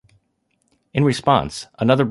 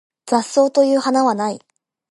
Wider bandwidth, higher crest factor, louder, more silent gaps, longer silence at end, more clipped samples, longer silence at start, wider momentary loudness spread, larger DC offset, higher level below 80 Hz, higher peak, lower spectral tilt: about the same, 11.5 kHz vs 11.5 kHz; about the same, 18 dB vs 16 dB; about the same, -19 LUFS vs -17 LUFS; neither; second, 0 s vs 0.55 s; neither; first, 0.95 s vs 0.25 s; about the same, 9 LU vs 9 LU; neither; first, -48 dBFS vs -74 dBFS; about the same, -2 dBFS vs -2 dBFS; first, -6.5 dB/octave vs -4 dB/octave